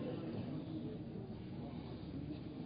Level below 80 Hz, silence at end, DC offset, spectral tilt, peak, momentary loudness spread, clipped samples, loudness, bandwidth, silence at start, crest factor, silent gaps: -62 dBFS; 0 s; under 0.1%; -8 dB/octave; -32 dBFS; 4 LU; under 0.1%; -46 LUFS; 5 kHz; 0 s; 12 dB; none